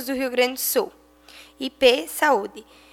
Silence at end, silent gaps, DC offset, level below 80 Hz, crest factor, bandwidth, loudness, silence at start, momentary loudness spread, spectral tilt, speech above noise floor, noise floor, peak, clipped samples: 0.3 s; none; under 0.1%; -58 dBFS; 22 dB; 18.5 kHz; -21 LUFS; 0 s; 14 LU; -1 dB/octave; 26 dB; -48 dBFS; -2 dBFS; under 0.1%